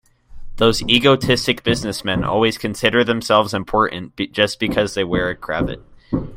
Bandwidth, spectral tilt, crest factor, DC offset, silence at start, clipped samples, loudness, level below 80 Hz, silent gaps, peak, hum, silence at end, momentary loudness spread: 16.5 kHz; -4.5 dB/octave; 18 dB; under 0.1%; 0.3 s; under 0.1%; -18 LUFS; -38 dBFS; none; 0 dBFS; none; 0 s; 10 LU